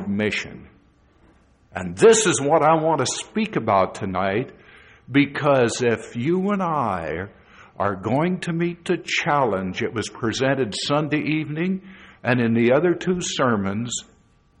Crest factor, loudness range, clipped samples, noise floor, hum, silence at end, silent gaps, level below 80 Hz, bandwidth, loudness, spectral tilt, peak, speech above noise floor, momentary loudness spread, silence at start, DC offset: 18 dB; 4 LU; under 0.1%; -56 dBFS; none; 0.6 s; none; -56 dBFS; 10 kHz; -21 LUFS; -4.5 dB/octave; -4 dBFS; 35 dB; 10 LU; 0 s; under 0.1%